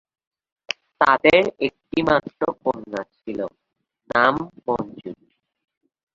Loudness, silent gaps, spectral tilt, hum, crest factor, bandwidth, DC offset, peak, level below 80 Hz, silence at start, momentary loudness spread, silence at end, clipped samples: -21 LUFS; none; -5.5 dB/octave; none; 22 dB; 7.6 kHz; under 0.1%; -2 dBFS; -56 dBFS; 0.7 s; 16 LU; 1 s; under 0.1%